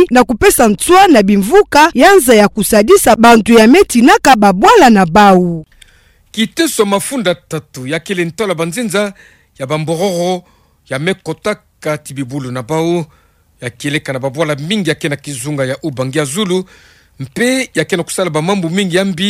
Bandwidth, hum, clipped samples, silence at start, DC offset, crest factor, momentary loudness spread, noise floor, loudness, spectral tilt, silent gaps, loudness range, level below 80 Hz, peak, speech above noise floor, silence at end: 16.5 kHz; none; under 0.1%; 0 s; under 0.1%; 12 dB; 15 LU; -48 dBFS; -11 LUFS; -4.5 dB/octave; none; 12 LU; -38 dBFS; 0 dBFS; 37 dB; 0 s